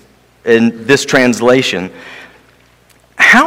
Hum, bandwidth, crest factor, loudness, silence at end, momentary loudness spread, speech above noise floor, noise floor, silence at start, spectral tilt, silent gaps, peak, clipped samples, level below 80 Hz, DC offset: none; 18.5 kHz; 12 dB; -11 LUFS; 0 s; 17 LU; 37 dB; -48 dBFS; 0.45 s; -4 dB/octave; none; 0 dBFS; 1%; -50 dBFS; under 0.1%